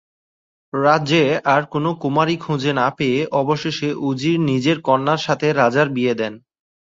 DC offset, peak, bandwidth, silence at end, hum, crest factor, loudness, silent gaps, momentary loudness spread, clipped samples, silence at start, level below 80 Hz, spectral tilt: under 0.1%; -2 dBFS; 7.8 kHz; 0.5 s; none; 18 dB; -18 LUFS; none; 6 LU; under 0.1%; 0.75 s; -60 dBFS; -6 dB/octave